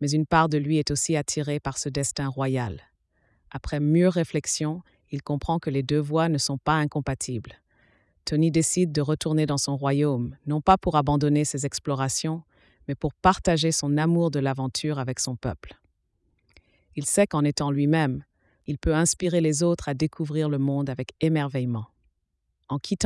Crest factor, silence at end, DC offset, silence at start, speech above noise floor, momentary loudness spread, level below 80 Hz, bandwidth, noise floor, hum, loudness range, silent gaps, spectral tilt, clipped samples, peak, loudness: 18 dB; 0 s; under 0.1%; 0 s; 52 dB; 12 LU; -46 dBFS; 12 kHz; -76 dBFS; none; 3 LU; none; -5 dB/octave; under 0.1%; -6 dBFS; -25 LUFS